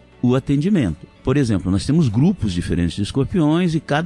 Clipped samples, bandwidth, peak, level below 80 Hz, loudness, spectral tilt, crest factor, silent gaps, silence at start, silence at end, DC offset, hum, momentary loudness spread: under 0.1%; 11.5 kHz; -6 dBFS; -40 dBFS; -19 LUFS; -7 dB/octave; 12 dB; none; 0.25 s; 0 s; under 0.1%; none; 5 LU